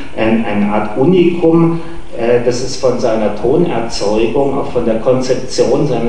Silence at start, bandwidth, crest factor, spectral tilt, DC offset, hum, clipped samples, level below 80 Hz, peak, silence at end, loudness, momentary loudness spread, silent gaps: 0 s; 10 kHz; 14 dB; -6.5 dB/octave; 10%; none; under 0.1%; -36 dBFS; 0 dBFS; 0 s; -14 LUFS; 6 LU; none